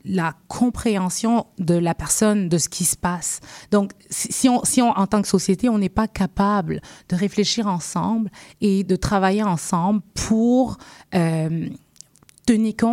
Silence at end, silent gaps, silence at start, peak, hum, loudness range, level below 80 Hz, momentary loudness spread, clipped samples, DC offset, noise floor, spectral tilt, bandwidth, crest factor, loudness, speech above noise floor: 0 s; none; 0.05 s; -4 dBFS; none; 2 LU; -44 dBFS; 8 LU; under 0.1%; under 0.1%; -49 dBFS; -5 dB/octave; 16 kHz; 18 dB; -21 LUFS; 29 dB